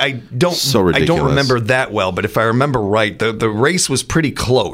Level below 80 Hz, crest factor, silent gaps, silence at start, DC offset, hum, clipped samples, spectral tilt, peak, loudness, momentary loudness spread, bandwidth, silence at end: -38 dBFS; 14 dB; none; 0 s; under 0.1%; none; under 0.1%; -4.5 dB/octave; -2 dBFS; -15 LUFS; 4 LU; 16 kHz; 0 s